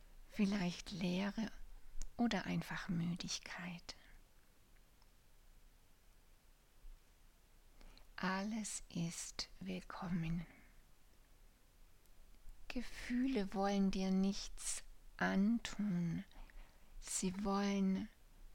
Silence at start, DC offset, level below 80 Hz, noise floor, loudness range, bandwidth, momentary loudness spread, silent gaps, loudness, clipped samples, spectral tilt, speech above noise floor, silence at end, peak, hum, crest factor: 0 s; under 0.1%; -56 dBFS; -66 dBFS; 10 LU; 16.5 kHz; 15 LU; none; -41 LUFS; under 0.1%; -5 dB/octave; 26 dB; 0 s; -24 dBFS; none; 18 dB